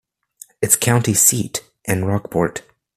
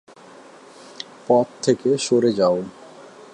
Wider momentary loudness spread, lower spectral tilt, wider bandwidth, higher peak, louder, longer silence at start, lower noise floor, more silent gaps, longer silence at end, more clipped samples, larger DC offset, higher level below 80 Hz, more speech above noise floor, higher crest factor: second, 13 LU vs 18 LU; about the same, -4 dB/octave vs -5 dB/octave; first, 15.5 kHz vs 10.5 kHz; first, 0 dBFS vs -4 dBFS; first, -17 LUFS vs -20 LUFS; second, 0.6 s vs 1 s; about the same, -46 dBFS vs -45 dBFS; neither; about the same, 0.35 s vs 0.3 s; neither; neither; first, -52 dBFS vs -66 dBFS; about the same, 28 dB vs 26 dB; about the same, 20 dB vs 18 dB